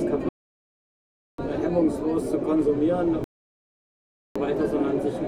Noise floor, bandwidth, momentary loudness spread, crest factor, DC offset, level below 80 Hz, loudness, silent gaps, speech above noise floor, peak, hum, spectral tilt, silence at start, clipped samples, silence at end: under -90 dBFS; 12 kHz; 12 LU; 16 dB; under 0.1%; -48 dBFS; -25 LUFS; 0.29-1.38 s, 3.24-4.35 s; over 67 dB; -10 dBFS; none; -8 dB/octave; 0 s; under 0.1%; 0 s